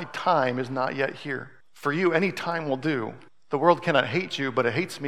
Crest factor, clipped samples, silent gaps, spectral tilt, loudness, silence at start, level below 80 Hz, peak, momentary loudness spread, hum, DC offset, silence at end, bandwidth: 20 dB; under 0.1%; none; -6 dB/octave; -26 LUFS; 0 s; -74 dBFS; -4 dBFS; 10 LU; none; 0.3%; 0 s; 14.5 kHz